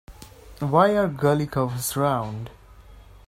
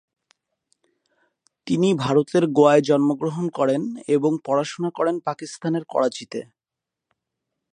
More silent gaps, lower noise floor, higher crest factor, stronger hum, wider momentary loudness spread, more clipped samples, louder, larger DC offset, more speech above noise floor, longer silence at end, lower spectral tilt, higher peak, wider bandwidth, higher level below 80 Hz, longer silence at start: neither; second, -47 dBFS vs -87 dBFS; about the same, 20 dB vs 20 dB; neither; about the same, 14 LU vs 13 LU; neither; about the same, -23 LUFS vs -21 LUFS; neither; second, 25 dB vs 66 dB; second, 0.3 s vs 1.3 s; about the same, -6 dB/octave vs -6.5 dB/octave; about the same, -4 dBFS vs -2 dBFS; first, 16 kHz vs 10 kHz; first, -50 dBFS vs -70 dBFS; second, 0.1 s vs 1.65 s